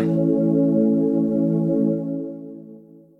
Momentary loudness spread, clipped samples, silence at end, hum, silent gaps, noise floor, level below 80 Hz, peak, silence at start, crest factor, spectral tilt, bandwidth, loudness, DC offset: 17 LU; under 0.1%; 0.4 s; none; none; -45 dBFS; -62 dBFS; -8 dBFS; 0 s; 12 dB; -12 dB/octave; 2.9 kHz; -20 LUFS; under 0.1%